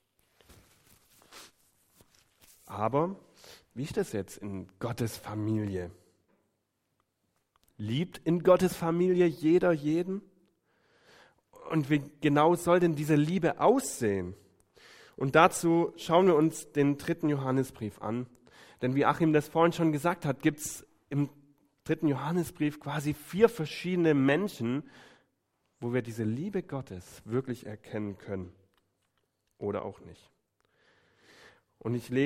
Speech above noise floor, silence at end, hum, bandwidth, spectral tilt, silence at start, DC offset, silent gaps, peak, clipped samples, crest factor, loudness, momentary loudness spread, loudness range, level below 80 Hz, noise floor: 51 dB; 0 s; none; 16 kHz; -6.5 dB/octave; 1.3 s; under 0.1%; none; -6 dBFS; under 0.1%; 24 dB; -29 LUFS; 15 LU; 11 LU; -66 dBFS; -79 dBFS